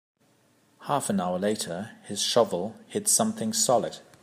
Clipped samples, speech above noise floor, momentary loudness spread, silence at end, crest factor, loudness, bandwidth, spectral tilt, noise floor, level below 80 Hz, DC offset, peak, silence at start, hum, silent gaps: under 0.1%; 38 dB; 12 LU; 0.2 s; 18 dB; -26 LUFS; 15.5 kHz; -3 dB/octave; -64 dBFS; -74 dBFS; under 0.1%; -8 dBFS; 0.8 s; none; none